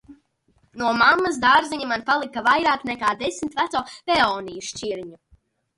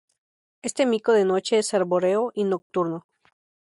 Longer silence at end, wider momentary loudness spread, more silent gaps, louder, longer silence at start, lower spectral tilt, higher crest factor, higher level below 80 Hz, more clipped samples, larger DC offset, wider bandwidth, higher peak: about the same, 0.65 s vs 0.6 s; first, 13 LU vs 10 LU; second, none vs 2.62-2.70 s; about the same, -21 LUFS vs -23 LUFS; second, 0.1 s vs 0.65 s; second, -2.5 dB/octave vs -4.5 dB/octave; about the same, 20 dB vs 16 dB; first, -56 dBFS vs -72 dBFS; neither; neither; about the same, 11.5 kHz vs 11.5 kHz; first, -4 dBFS vs -8 dBFS